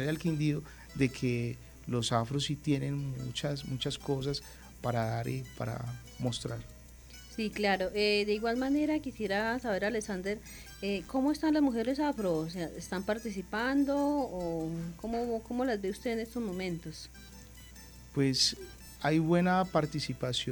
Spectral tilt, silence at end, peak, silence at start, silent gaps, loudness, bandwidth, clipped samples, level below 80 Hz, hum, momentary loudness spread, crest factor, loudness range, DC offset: -5 dB/octave; 0 s; -14 dBFS; 0 s; none; -33 LUFS; over 20 kHz; under 0.1%; -54 dBFS; none; 16 LU; 20 dB; 5 LU; under 0.1%